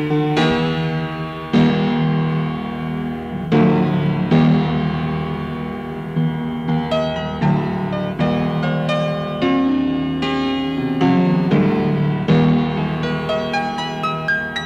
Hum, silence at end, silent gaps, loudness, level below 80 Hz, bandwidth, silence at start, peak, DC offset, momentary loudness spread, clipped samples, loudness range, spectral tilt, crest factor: none; 0 s; none; -19 LUFS; -42 dBFS; 7.8 kHz; 0 s; -4 dBFS; under 0.1%; 9 LU; under 0.1%; 3 LU; -7.5 dB/octave; 14 dB